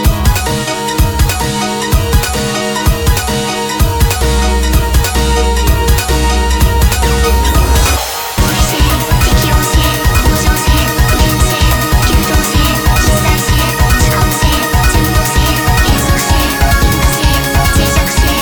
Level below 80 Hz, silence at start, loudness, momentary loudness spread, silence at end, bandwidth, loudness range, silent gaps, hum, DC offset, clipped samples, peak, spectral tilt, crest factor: -14 dBFS; 0 s; -11 LUFS; 3 LU; 0 s; 19.5 kHz; 2 LU; none; none; 0.1%; under 0.1%; 0 dBFS; -4 dB/octave; 10 dB